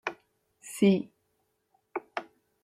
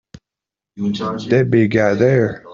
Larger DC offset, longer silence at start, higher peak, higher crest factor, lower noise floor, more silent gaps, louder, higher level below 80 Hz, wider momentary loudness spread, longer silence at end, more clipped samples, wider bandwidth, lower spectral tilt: neither; second, 0.05 s vs 0.75 s; second, -10 dBFS vs -2 dBFS; first, 22 dB vs 16 dB; second, -76 dBFS vs -86 dBFS; neither; second, -30 LUFS vs -16 LUFS; second, -76 dBFS vs -52 dBFS; first, 19 LU vs 9 LU; first, 0.4 s vs 0 s; neither; first, 14.5 kHz vs 7.4 kHz; second, -6 dB/octave vs -7.5 dB/octave